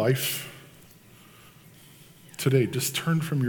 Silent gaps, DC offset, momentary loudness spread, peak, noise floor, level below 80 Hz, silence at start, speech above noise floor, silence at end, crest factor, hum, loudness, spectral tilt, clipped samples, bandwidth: none; under 0.1%; 19 LU; -10 dBFS; -52 dBFS; -66 dBFS; 0 s; 27 dB; 0 s; 20 dB; none; -26 LUFS; -5 dB/octave; under 0.1%; 19 kHz